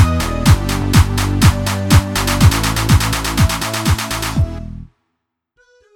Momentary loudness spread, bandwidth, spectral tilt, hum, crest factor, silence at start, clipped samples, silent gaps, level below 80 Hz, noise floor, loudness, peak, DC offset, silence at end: 7 LU; 19 kHz; -5 dB/octave; none; 14 dB; 0 s; under 0.1%; none; -22 dBFS; -74 dBFS; -15 LUFS; 0 dBFS; under 0.1%; 1.1 s